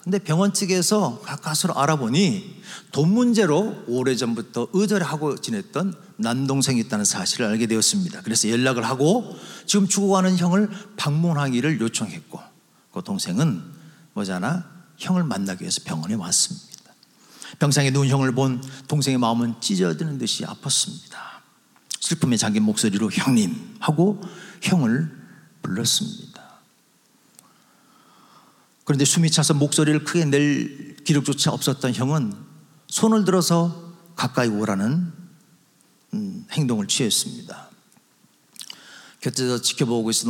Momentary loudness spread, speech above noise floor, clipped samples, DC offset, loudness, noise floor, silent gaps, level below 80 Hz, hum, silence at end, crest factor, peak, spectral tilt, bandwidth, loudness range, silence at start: 14 LU; 39 dB; under 0.1%; under 0.1%; -22 LUFS; -60 dBFS; none; -74 dBFS; none; 0 s; 18 dB; -4 dBFS; -4.5 dB/octave; 17 kHz; 6 LU; 0.05 s